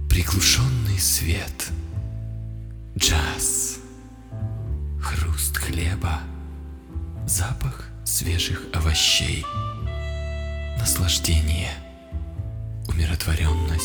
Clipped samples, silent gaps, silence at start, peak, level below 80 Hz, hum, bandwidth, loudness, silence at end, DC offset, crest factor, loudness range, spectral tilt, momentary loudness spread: under 0.1%; none; 0 s; -4 dBFS; -30 dBFS; none; over 20 kHz; -23 LUFS; 0 s; under 0.1%; 20 dB; 4 LU; -3 dB/octave; 16 LU